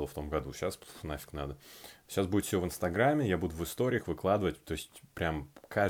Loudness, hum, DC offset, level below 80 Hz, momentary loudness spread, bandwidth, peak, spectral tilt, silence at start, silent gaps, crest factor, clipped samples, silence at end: -34 LUFS; none; under 0.1%; -52 dBFS; 13 LU; over 20 kHz; -14 dBFS; -5.5 dB/octave; 0 s; none; 18 dB; under 0.1%; 0 s